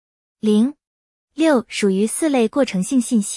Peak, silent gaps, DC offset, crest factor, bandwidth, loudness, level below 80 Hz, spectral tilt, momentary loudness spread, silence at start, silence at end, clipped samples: -4 dBFS; 0.87-1.28 s; under 0.1%; 14 dB; 12 kHz; -19 LUFS; -62 dBFS; -5 dB/octave; 4 LU; 0.45 s; 0 s; under 0.1%